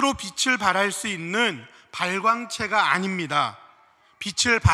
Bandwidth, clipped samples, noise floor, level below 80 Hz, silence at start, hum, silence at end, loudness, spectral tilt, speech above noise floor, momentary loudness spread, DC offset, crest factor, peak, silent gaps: 14 kHz; under 0.1%; -57 dBFS; -48 dBFS; 0 s; none; 0 s; -23 LUFS; -3.5 dB/octave; 34 dB; 9 LU; under 0.1%; 20 dB; -4 dBFS; none